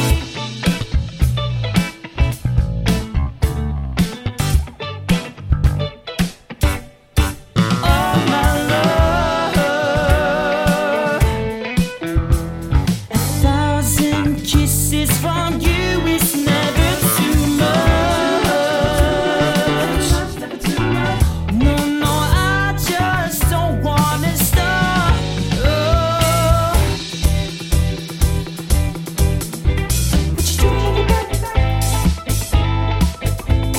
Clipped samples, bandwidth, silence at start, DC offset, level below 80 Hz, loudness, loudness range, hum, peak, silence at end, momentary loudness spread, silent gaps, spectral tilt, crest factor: under 0.1%; 17 kHz; 0 s; under 0.1%; -22 dBFS; -17 LUFS; 5 LU; none; -2 dBFS; 0 s; 6 LU; none; -5 dB/octave; 14 dB